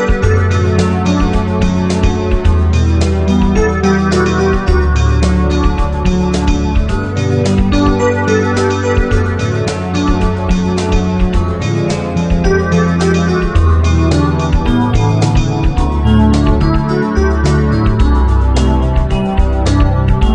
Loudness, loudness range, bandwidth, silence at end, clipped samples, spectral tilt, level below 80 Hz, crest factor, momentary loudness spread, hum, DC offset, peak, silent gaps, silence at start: -13 LUFS; 2 LU; 10 kHz; 0 s; under 0.1%; -7 dB/octave; -16 dBFS; 10 dB; 3 LU; none; 0.2%; 0 dBFS; none; 0 s